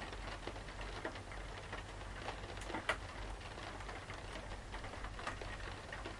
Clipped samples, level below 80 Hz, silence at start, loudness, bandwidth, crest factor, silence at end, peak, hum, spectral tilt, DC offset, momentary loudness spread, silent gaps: under 0.1%; -52 dBFS; 0 s; -46 LUFS; 11.5 kHz; 24 dB; 0 s; -22 dBFS; none; -4 dB/octave; under 0.1%; 7 LU; none